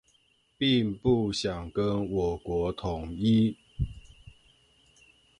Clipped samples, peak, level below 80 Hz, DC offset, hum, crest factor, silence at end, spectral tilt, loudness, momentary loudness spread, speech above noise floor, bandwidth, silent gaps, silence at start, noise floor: under 0.1%; -12 dBFS; -46 dBFS; under 0.1%; none; 18 dB; 1.1 s; -6.5 dB/octave; -29 LUFS; 10 LU; 40 dB; 11 kHz; none; 0.6 s; -68 dBFS